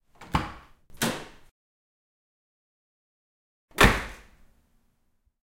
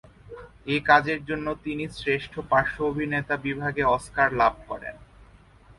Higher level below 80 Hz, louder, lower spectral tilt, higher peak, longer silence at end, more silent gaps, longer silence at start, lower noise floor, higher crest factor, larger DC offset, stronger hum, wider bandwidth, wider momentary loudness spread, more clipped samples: first, -40 dBFS vs -50 dBFS; about the same, -25 LUFS vs -25 LUFS; second, -4 dB/octave vs -6 dB/octave; about the same, 0 dBFS vs -2 dBFS; first, 1.3 s vs 0.55 s; first, 1.51-3.68 s vs none; about the same, 0.2 s vs 0.25 s; first, -70 dBFS vs -52 dBFS; first, 30 dB vs 24 dB; neither; neither; first, 16 kHz vs 11.5 kHz; first, 20 LU vs 17 LU; neither